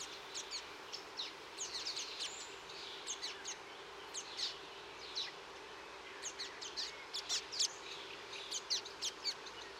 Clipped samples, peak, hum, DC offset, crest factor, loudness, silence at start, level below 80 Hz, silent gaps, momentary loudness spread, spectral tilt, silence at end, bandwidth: under 0.1%; -24 dBFS; none; under 0.1%; 20 dB; -43 LUFS; 0 s; -76 dBFS; none; 11 LU; 1 dB/octave; 0 s; 16 kHz